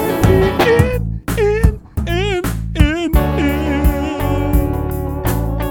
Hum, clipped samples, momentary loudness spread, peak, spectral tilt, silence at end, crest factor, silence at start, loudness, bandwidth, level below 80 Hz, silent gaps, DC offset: none; under 0.1%; 8 LU; 0 dBFS; -6.5 dB/octave; 0 s; 14 dB; 0 s; -16 LUFS; 18.5 kHz; -20 dBFS; none; under 0.1%